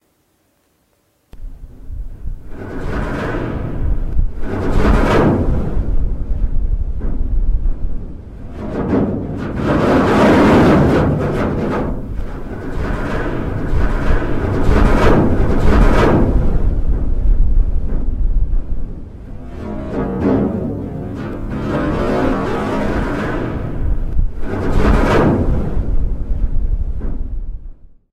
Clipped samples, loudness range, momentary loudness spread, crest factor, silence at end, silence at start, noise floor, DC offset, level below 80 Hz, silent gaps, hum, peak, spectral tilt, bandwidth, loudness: under 0.1%; 9 LU; 16 LU; 14 dB; 0.25 s; 1.35 s; -60 dBFS; under 0.1%; -18 dBFS; none; none; 0 dBFS; -8 dB/octave; 8.8 kHz; -18 LUFS